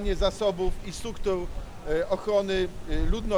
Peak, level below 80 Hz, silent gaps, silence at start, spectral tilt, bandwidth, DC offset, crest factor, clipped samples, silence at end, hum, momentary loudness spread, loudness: -12 dBFS; -32 dBFS; none; 0 s; -5.5 dB/octave; 12.5 kHz; under 0.1%; 14 dB; under 0.1%; 0 s; none; 11 LU; -29 LUFS